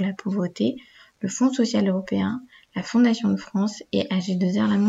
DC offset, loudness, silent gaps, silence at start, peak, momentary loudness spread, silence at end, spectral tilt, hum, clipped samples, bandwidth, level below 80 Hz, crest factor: under 0.1%; -24 LUFS; none; 0 s; -8 dBFS; 12 LU; 0 s; -6 dB/octave; none; under 0.1%; 8 kHz; -64 dBFS; 14 dB